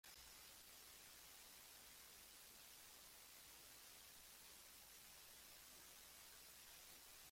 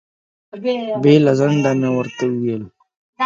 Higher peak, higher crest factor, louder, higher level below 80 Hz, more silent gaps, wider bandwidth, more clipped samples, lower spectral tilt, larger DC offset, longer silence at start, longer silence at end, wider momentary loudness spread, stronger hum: second, -50 dBFS vs 0 dBFS; about the same, 14 dB vs 18 dB; second, -61 LUFS vs -17 LUFS; second, -82 dBFS vs -62 dBFS; second, none vs 2.97-3.13 s; first, 16.5 kHz vs 7.6 kHz; neither; second, 0 dB/octave vs -7 dB/octave; neither; second, 0.05 s vs 0.55 s; about the same, 0 s vs 0 s; second, 1 LU vs 11 LU; neither